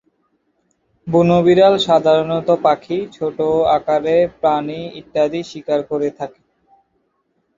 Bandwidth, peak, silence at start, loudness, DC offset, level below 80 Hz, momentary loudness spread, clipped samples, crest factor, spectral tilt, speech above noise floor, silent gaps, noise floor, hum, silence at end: 7.6 kHz; 0 dBFS; 1.05 s; -16 LUFS; under 0.1%; -52 dBFS; 13 LU; under 0.1%; 16 dB; -6.5 dB/octave; 51 dB; none; -67 dBFS; none; 1.3 s